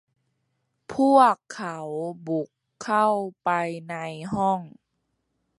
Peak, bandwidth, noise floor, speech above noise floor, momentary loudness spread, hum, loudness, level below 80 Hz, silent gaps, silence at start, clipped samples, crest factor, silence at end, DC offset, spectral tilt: -4 dBFS; 11.5 kHz; -76 dBFS; 52 dB; 16 LU; none; -24 LUFS; -66 dBFS; none; 0.9 s; under 0.1%; 22 dB; 0.9 s; under 0.1%; -6 dB/octave